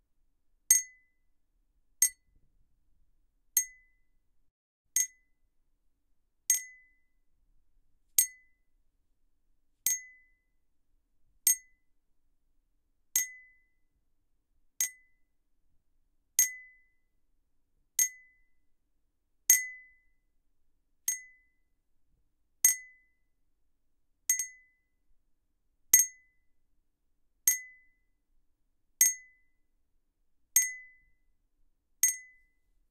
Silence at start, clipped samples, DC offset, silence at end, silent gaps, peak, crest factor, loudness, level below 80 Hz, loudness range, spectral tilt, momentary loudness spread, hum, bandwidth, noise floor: 0.7 s; under 0.1%; under 0.1%; 0.7 s; 4.51-4.85 s; -6 dBFS; 30 dB; -28 LUFS; -72 dBFS; 5 LU; 4 dB/octave; 14 LU; none; 15.5 kHz; -75 dBFS